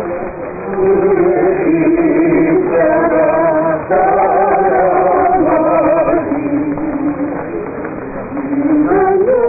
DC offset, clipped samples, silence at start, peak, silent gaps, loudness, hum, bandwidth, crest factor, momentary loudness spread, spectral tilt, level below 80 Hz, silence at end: under 0.1%; under 0.1%; 0 s; -4 dBFS; none; -13 LUFS; none; 2.7 kHz; 8 dB; 11 LU; -16.5 dB/octave; -40 dBFS; 0 s